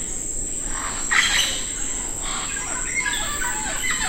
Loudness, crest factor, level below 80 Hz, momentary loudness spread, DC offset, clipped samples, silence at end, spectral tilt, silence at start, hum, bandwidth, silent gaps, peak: -22 LUFS; 22 dB; -36 dBFS; 7 LU; under 0.1%; under 0.1%; 0 s; 0 dB/octave; 0 s; none; 16 kHz; none; -2 dBFS